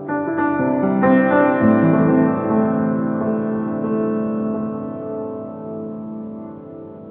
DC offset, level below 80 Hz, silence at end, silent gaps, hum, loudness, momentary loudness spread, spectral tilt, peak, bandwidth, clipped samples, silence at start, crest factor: under 0.1%; -56 dBFS; 0 s; none; none; -18 LUFS; 16 LU; -8.5 dB/octave; -2 dBFS; 3.8 kHz; under 0.1%; 0 s; 16 dB